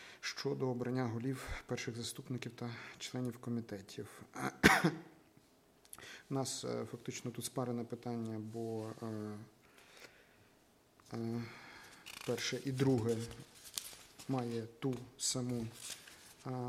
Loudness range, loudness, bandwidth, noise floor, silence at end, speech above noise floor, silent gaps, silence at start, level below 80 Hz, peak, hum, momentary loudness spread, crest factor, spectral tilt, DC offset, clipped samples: 10 LU; -39 LUFS; 16 kHz; -68 dBFS; 0 s; 30 dB; none; 0 s; -64 dBFS; -10 dBFS; none; 17 LU; 30 dB; -4.5 dB/octave; under 0.1%; under 0.1%